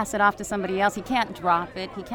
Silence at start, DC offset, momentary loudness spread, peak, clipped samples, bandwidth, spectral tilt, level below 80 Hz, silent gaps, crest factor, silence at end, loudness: 0 s; under 0.1%; 8 LU; -8 dBFS; under 0.1%; 19 kHz; -4 dB/octave; -52 dBFS; none; 18 dB; 0 s; -25 LUFS